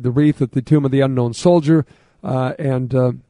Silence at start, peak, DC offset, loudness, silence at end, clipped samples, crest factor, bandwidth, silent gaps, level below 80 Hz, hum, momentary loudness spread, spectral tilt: 0 s; -2 dBFS; under 0.1%; -17 LUFS; 0.1 s; under 0.1%; 16 dB; 11 kHz; none; -50 dBFS; none; 7 LU; -8 dB/octave